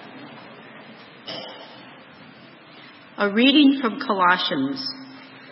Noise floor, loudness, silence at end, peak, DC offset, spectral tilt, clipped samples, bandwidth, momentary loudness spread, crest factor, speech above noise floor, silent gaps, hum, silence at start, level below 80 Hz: -46 dBFS; -19 LUFS; 0 s; -4 dBFS; under 0.1%; -7.5 dB/octave; under 0.1%; 5.8 kHz; 26 LU; 20 dB; 27 dB; none; none; 0 s; -78 dBFS